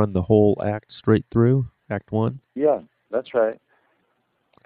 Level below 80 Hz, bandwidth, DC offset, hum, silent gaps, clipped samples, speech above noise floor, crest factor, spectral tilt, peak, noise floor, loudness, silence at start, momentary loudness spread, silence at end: -50 dBFS; 4.6 kHz; under 0.1%; none; none; under 0.1%; 49 dB; 18 dB; -13 dB/octave; -4 dBFS; -70 dBFS; -22 LUFS; 0 s; 11 LU; 1.1 s